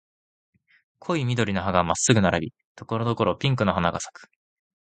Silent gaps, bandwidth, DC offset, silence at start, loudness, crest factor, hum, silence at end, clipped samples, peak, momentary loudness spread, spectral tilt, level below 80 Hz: 2.64-2.75 s; 9.4 kHz; under 0.1%; 1.05 s; -24 LUFS; 22 dB; none; 0.6 s; under 0.1%; -2 dBFS; 13 LU; -5 dB/octave; -48 dBFS